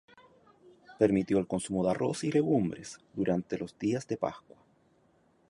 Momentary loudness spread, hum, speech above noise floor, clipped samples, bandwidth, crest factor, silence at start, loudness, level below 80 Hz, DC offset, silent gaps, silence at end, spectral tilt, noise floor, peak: 10 LU; none; 37 dB; under 0.1%; 11.5 kHz; 22 dB; 0.9 s; -31 LUFS; -62 dBFS; under 0.1%; none; 1.1 s; -6.5 dB/octave; -67 dBFS; -10 dBFS